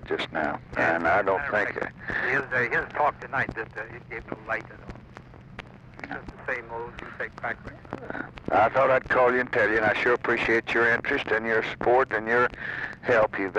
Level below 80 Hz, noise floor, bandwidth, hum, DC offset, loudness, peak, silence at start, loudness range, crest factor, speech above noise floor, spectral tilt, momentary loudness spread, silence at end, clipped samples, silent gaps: -52 dBFS; -46 dBFS; 9.8 kHz; none; under 0.1%; -25 LUFS; -10 dBFS; 0 s; 13 LU; 16 dB; 20 dB; -6 dB/octave; 16 LU; 0 s; under 0.1%; none